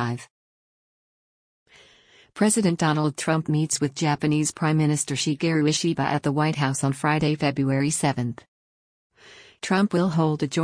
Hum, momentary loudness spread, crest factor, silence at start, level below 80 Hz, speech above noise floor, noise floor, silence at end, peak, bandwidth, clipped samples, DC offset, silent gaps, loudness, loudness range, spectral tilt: none; 4 LU; 16 dB; 0 s; -60 dBFS; 33 dB; -56 dBFS; 0 s; -8 dBFS; 10.5 kHz; under 0.1%; under 0.1%; 0.30-1.66 s, 8.48-9.10 s; -23 LUFS; 3 LU; -5 dB/octave